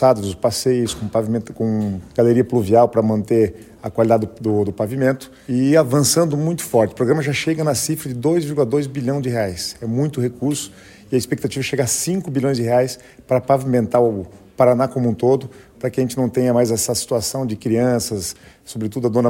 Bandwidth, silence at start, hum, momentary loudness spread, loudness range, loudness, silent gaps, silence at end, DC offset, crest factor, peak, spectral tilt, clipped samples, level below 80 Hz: 16.5 kHz; 0 s; none; 9 LU; 4 LU; -19 LUFS; none; 0 s; under 0.1%; 18 dB; -2 dBFS; -5.5 dB/octave; under 0.1%; -50 dBFS